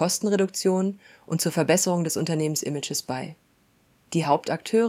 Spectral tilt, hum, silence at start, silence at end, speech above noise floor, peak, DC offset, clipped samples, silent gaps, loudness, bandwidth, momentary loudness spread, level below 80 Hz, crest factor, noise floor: -4.5 dB/octave; none; 0 s; 0 s; 38 dB; -6 dBFS; under 0.1%; under 0.1%; none; -25 LUFS; 16.5 kHz; 10 LU; -70 dBFS; 20 dB; -63 dBFS